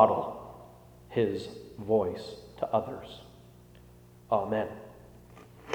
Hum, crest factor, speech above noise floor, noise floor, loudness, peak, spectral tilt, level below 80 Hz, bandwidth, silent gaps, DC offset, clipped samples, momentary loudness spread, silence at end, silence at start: 60 Hz at -55 dBFS; 26 dB; 25 dB; -54 dBFS; -32 LUFS; -6 dBFS; -7 dB/octave; -60 dBFS; over 20 kHz; none; under 0.1%; under 0.1%; 24 LU; 0 s; 0 s